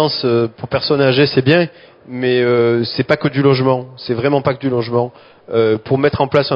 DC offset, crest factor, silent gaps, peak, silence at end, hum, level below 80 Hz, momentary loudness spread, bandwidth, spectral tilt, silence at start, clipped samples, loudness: under 0.1%; 16 dB; none; 0 dBFS; 0 s; none; -48 dBFS; 8 LU; 6 kHz; -8.5 dB/octave; 0 s; under 0.1%; -15 LUFS